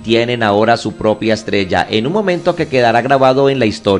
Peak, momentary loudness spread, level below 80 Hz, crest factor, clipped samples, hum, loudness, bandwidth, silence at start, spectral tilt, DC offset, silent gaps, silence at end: 0 dBFS; 5 LU; -42 dBFS; 12 dB; under 0.1%; none; -13 LUFS; 11 kHz; 0 s; -6 dB/octave; under 0.1%; none; 0 s